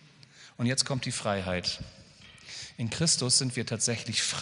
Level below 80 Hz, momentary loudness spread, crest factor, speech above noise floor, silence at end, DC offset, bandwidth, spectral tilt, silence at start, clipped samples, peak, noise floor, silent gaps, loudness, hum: -60 dBFS; 17 LU; 22 dB; 25 dB; 0 s; under 0.1%; 11 kHz; -3 dB/octave; 0.35 s; under 0.1%; -8 dBFS; -54 dBFS; none; -28 LUFS; none